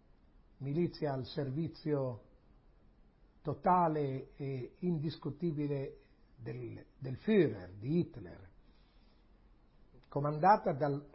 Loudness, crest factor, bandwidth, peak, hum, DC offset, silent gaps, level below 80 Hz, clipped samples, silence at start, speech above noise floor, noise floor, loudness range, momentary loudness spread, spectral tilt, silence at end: -35 LUFS; 22 dB; 5.6 kHz; -14 dBFS; none; under 0.1%; none; -64 dBFS; under 0.1%; 0.6 s; 29 dB; -64 dBFS; 4 LU; 17 LU; -7 dB/octave; 0.05 s